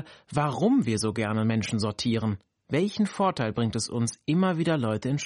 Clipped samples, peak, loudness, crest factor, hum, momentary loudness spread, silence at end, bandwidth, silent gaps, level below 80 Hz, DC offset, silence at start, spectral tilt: under 0.1%; -12 dBFS; -27 LUFS; 14 dB; none; 5 LU; 0 s; 11.5 kHz; none; -58 dBFS; under 0.1%; 0 s; -5.5 dB/octave